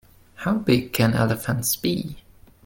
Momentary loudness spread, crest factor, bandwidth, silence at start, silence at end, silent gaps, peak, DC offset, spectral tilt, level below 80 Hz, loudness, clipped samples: 9 LU; 18 dB; 17 kHz; 0.4 s; 0.45 s; none; -6 dBFS; under 0.1%; -5 dB/octave; -48 dBFS; -23 LUFS; under 0.1%